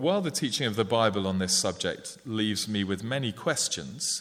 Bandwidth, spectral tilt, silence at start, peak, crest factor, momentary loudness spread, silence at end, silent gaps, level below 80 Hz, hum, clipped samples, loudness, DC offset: 16 kHz; -3.5 dB/octave; 0 s; -8 dBFS; 20 dB; 6 LU; 0 s; none; -64 dBFS; none; under 0.1%; -28 LUFS; under 0.1%